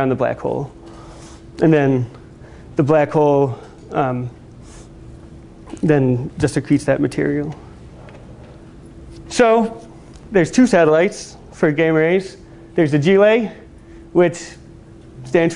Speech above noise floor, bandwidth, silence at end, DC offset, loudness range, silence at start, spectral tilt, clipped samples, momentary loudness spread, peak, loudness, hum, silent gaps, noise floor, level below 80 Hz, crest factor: 25 dB; 11 kHz; 0 s; under 0.1%; 5 LU; 0 s; -6.5 dB/octave; under 0.1%; 22 LU; -2 dBFS; -17 LUFS; none; none; -40 dBFS; -46 dBFS; 18 dB